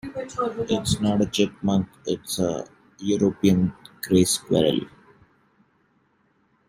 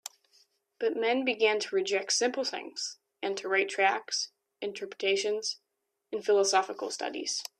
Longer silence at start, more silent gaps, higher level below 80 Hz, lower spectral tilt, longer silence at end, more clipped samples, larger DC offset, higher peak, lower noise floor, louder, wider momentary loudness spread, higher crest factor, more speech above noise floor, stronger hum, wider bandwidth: second, 0.05 s vs 0.8 s; neither; first, -52 dBFS vs -84 dBFS; first, -5.5 dB/octave vs -1 dB/octave; first, 1.8 s vs 0.1 s; neither; neither; first, -6 dBFS vs -12 dBFS; about the same, -65 dBFS vs -67 dBFS; first, -23 LUFS vs -30 LUFS; about the same, 12 LU vs 12 LU; about the same, 18 dB vs 18 dB; first, 43 dB vs 38 dB; neither; first, 16 kHz vs 14.5 kHz